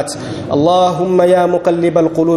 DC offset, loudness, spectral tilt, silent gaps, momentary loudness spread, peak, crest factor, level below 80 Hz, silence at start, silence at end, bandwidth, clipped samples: under 0.1%; -13 LUFS; -6.5 dB/octave; none; 8 LU; 0 dBFS; 12 dB; -48 dBFS; 0 s; 0 s; 12.5 kHz; under 0.1%